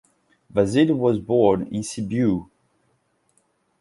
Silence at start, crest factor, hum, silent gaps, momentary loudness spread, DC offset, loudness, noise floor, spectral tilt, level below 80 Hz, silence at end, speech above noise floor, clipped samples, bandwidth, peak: 0.55 s; 18 dB; none; none; 9 LU; under 0.1%; -21 LUFS; -67 dBFS; -6.5 dB/octave; -52 dBFS; 1.35 s; 47 dB; under 0.1%; 11.5 kHz; -4 dBFS